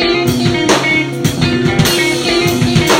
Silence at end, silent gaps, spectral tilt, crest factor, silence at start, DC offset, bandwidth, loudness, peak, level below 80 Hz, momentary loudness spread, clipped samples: 0 s; none; -4.5 dB/octave; 12 dB; 0 s; under 0.1%; 16.5 kHz; -12 LUFS; 0 dBFS; -34 dBFS; 3 LU; under 0.1%